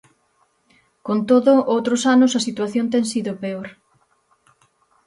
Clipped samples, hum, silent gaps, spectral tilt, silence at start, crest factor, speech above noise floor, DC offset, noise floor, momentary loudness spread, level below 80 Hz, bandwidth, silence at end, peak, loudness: under 0.1%; none; none; -4.5 dB/octave; 1.05 s; 18 dB; 46 dB; under 0.1%; -64 dBFS; 14 LU; -68 dBFS; 11.5 kHz; 1.35 s; -4 dBFS; -18 LUFS